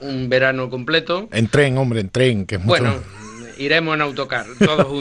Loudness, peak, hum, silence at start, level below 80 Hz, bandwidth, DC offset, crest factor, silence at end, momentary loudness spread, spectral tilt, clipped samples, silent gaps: -18 LUFS; -2 dBFS; none; 0 s; -46 dBFS; 10.5 kHz; under 0.1%; 16 dB; 0 s; 9 LU; -6 dB/octave; under 0.1%; none